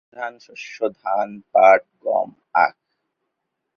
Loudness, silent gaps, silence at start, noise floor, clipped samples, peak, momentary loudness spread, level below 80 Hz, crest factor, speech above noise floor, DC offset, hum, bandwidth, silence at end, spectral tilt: -19 LUFS; none; 0.15 s; -78 dBFS; under 0.1%; -2 dBFS; 18 LU; -74 dBFS; 20 dB; 59 dB; under 0.1%; none; 6.8 kHz; 1.05 s; -4.5 dB/octave